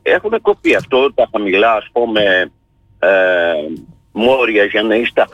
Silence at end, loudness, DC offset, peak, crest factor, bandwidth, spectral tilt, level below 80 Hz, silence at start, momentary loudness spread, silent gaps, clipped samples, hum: 0.05 s; -13 LUFS; under 0.1%; -2 dBFS; 12 dB; 12 kHz; -5 dB/octave; -50 dBFS; 0.05 s; 7 LU; none; under 0.1%; none